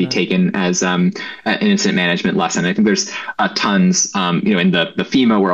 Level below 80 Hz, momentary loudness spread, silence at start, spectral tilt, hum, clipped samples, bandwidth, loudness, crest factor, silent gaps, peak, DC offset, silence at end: -56 dBFS; 5 LU; 0 s; -4 dB/octave; none; under 0.1%; 8.2 kHz; -16 LUFS; 12 dB; none; -2 dBFS; 0.1%; 0 s